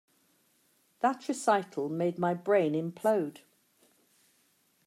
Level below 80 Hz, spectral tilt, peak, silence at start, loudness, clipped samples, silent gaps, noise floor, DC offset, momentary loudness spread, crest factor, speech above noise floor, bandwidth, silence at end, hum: -84 dBFS; -6 dB/octave; -12 dBFS; 1.05 s; -30 LUFS; under 0.1%; none; -70 dBFS; under 0.1%; 5 LU; 20 dB; 41 dB; 15.5 kHz; 1.55 s; none